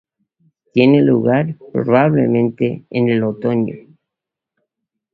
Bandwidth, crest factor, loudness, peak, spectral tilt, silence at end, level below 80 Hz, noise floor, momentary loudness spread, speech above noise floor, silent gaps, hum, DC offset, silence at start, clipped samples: 4.7 kHz; 16 dB; -16 LUFS; 0 dBFS; -10.5 dB/octave; 1.35 s; -58 dBFS; -84 dBFS; 9 LU; 69 dB; none; none; under 0.1%; 0.75 s; under 0.1%